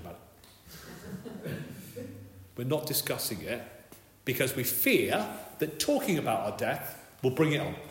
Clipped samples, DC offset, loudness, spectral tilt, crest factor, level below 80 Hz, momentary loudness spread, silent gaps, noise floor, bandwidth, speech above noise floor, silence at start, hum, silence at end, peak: under 0.1%; under 0.1%; -30 LUFS; -4.5 dB/octave; 20 dB; -64 dBFS; 20 LU; none; -55 dBFS; 16.5 kHz; 25 dB; 0 s; none; 0 s; -14 dBFS